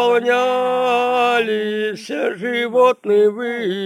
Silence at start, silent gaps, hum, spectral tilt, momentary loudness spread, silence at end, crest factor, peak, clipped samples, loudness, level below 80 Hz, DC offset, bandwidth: 0 s; none; none; -4.5 dB/octave; 8 LU; 0 s; 14 dB; -2 dBFS; under 0.1%; -17 LUFS; -78 dBFS; under 0.1%; 16 kHz